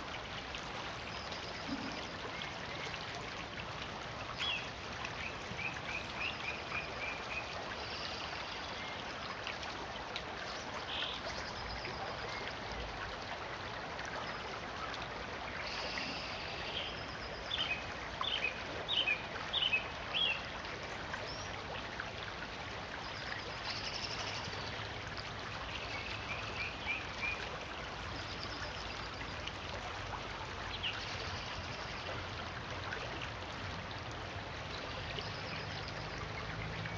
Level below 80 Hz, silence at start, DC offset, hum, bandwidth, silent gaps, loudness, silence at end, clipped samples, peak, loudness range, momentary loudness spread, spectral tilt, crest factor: -56 dBFS; 0 s; under 0.1%; none; 10 kHz; none; -40 LUFS; 0 s; under 0.1%; -22 dBFS; 6 LU; 6 LU; -3.5 dB/octave; 20 dB